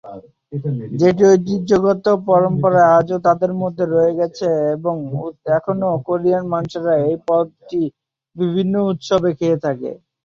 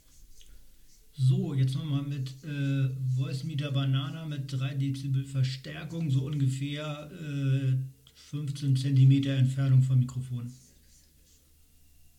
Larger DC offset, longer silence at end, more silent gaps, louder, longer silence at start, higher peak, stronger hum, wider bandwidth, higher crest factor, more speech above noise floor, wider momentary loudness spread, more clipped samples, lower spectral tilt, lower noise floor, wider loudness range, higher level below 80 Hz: neither; second, 0.3 s vs 1.6 s; neither; first, -17 LUFS vs -29 LUFS; second, 0.05 s vs 0.2 s; first, -2 dBFS vs -14 dBFS; neither; second, 7.4 kHz vs 10 kHz; about the same, 16 dB vs 16 dB; second, 20 dB vs 32 dB; about the same, 11 LU vs 13 LU; neither; about the same, -7.5 dB/octave vs -7.5 dB/octave; second, -37 dBFS vs -60 dBFS; about the same, 5 LU vs 5 LU; first, -54 dBFS vs -60 dBFS